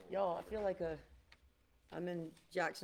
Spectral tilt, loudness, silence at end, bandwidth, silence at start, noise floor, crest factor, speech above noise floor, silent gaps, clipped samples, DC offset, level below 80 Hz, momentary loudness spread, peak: -5.5 dB/octave; -42 LUFS; 0 s; 16.5 kHz; 0 s; -71 dBFS; 18 dB; 30 dB; none; under 0.1%; under 0.1%; -66 dBFS; 9 LU; -26 dBFS